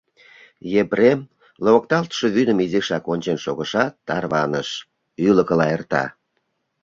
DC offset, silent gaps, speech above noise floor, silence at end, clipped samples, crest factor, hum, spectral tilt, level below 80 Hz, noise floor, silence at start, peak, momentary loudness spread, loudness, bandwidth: under 0.1%; none; 53 dB; 0.7 s; under 0.1%; 18 dB; none; -6 dB/octave; -58 dBFS; -72 dBFS; 0.65 s; -2 dBFS; 9 LU; -20 LUFS; 7.6 kHz